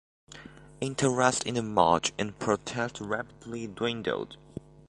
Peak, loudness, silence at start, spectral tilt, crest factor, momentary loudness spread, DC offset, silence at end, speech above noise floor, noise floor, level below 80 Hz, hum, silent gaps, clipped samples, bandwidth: -6 dBFS; -29 LUFS; 0.3 s; -4 dB/octave; 24 dB; 20 LU; under 0.1%; 0.3 s; 20 dB; -49 dBFS; -58 dBFS; none; none; under 0.1%; 11.5 kHz